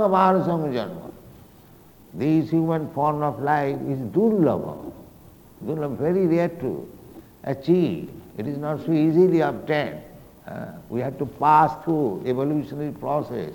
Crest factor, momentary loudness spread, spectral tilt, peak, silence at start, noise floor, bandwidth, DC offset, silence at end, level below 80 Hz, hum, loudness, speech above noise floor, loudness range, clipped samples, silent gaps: 18 dB; 18 LU; -8.5 dB/octave; -4 dBFS; 0 s; -50 dBFS; 19.5 kHz; under 0.1%; 0 s; -56 dBFS; none; -23 LUFS; 27 dB; 3 LU; under 0.1%; none